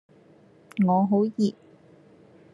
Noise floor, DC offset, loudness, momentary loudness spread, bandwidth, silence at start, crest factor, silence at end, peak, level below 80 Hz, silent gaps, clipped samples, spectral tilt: -55 dBFS; under 0.1%; -24 LUFS; 6 LU; 7.6 kHz; 0.75 s; 16 dB; 1 s; -12 dBFS; -72 dBFS; none; under 0.1%; -8.5 dB/octave